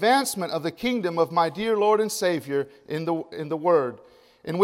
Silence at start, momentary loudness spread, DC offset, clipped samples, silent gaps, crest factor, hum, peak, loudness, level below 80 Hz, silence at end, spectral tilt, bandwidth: 0 s; 10 LU; under 0.1%; under 0.1%; none; 18 dB; none; -6 dBFS; -25 LUFS; -64 dBFS; 0 s; -4.5 dB/octave; 16 kHz